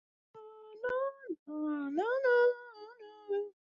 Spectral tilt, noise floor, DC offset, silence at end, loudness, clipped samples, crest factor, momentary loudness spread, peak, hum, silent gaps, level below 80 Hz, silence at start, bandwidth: -5.5 dB/octave; -52 dBFS; under 0.1%; 0.2 s; -33 LUFS; under 0.1%; 14 dB; 24 LU; -20 dBFS; none; 1.39-1.46 s; -78 dBFS; 0.35 s; 6.6 kHz